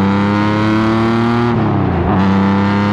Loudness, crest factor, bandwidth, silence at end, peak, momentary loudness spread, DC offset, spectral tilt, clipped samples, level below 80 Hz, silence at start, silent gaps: -13 LUFS; 10 dB; 8 kHz; 0 s; -2 dBFS; 2 LU; under 0.1%; -8 dB/octave; under 0.1%; -34 dBFS; 0 s; none